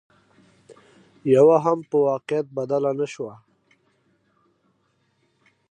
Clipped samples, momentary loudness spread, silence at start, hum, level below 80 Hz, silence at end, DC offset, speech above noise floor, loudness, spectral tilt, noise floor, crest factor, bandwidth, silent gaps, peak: under 0.1%; 15 LU; 1.25 s; none; -76 dBFS; 2.4 s; under 0.1%; 48 dB; -21 LUFS; -7.5 dB/octave; -68 dBFS; 20 dB; 9.4 kHz; none; -6 dBFS